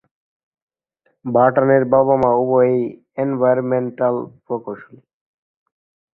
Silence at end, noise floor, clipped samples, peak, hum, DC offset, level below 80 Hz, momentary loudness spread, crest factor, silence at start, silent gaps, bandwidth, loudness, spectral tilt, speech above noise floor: 1.3 s; -67 dBFS; under 0.1%; -2 dBFS; none; under 0.1%; -58 dBFS; 13 LU; 18 dB; 1.25 s; none; 3.2 kHz; -17 LUFS; -11 dB/octave; 50 dB